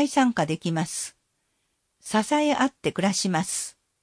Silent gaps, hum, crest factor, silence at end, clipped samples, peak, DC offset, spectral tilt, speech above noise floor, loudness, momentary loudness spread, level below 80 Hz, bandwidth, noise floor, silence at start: none; none; 16 dB; 0.3 s; under 0.1%; -10 dBFS; under 0.1%; -4 dB/octave; 49 dB; -25 LUFS; 10 LU; -66 dBFS; 10.5 kHz; -74 dBFS; 0 s